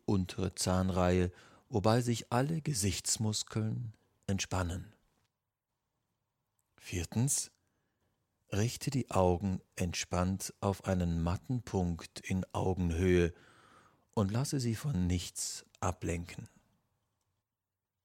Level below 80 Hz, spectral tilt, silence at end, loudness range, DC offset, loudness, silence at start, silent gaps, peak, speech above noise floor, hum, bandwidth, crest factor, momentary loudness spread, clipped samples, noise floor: -54 dBFS; -5 dB/octave; 1.55 s; 7 LU; under 0.1%; -34 LUFS; 0.1 s; none; -12 dBFS; over 57 dB; none; 16.5 kHz; 22 dB; 10 LU; under 0.1%; under -90 dBFS